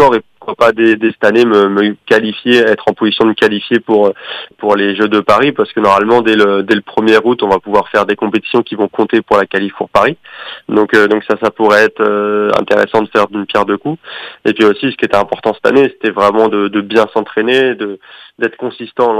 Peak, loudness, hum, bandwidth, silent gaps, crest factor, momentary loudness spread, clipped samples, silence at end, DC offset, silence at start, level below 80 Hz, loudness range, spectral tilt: 0 dBFS; -11 LUFS; none; 12 kHz; none; 12 dB; 8 LU; 0.1%; 0 s; under 0.1%; 0 s; -52 dBFS; 2 LU; -5.5 dB/octave